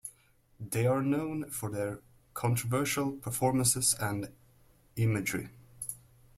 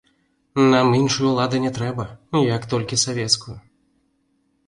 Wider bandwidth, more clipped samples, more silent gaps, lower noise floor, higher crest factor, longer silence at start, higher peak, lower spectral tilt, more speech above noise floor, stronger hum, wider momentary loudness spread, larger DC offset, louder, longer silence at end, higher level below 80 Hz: first, 16.5 kHz vs 11.5 kHz; neither; neither; about the same, -65 dBFS vs -66 dBFS; about the same, 20 dB vs 18 dB; second, 0.05 s vs 0.55 s; second, -12 dBFS vs -2 dBFS; about the same, -4.5 dB/octave vs -4.5 dB/octave; second, 34 dB vs 47 dB; neither; first, 18 LU vs 11 LU; neither; second, -31 LUFS vs -20 LUFS; second, 0.4 s vs 1.1 s; second, -60 dBFS vs -54 dBFS